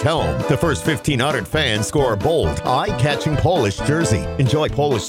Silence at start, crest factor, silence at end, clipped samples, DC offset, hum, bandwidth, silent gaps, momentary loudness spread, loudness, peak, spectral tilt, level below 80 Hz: 0 s; 14 dB; 0 s; under 0.1%; under 0.1%; none; 16.5 kHz; none; 2 LU; -18 LUFS; -4 dBFS; -5 dB/octave; -36 dBFS